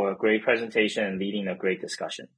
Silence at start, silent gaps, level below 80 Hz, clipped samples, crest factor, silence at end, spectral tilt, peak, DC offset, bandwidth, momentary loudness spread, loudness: 0 s; none; -72 dBFS; under 0.1%; 20 dB; 0.1 s; -4.5 dB/octave; -6 dBFS; under 0.1%; 10.5 kHz; 8 LU; -26 LUFS